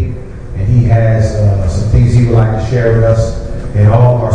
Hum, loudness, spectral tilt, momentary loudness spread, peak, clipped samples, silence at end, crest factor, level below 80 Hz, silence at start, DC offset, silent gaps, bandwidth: none; -11 LUFS; -8.5 dB/octave; 10 LU; 0 dBFS; under 0.1%; 0 s; 10 dB; -20 dBFS; 0 s; under 0.1%; none; 9.2 kHz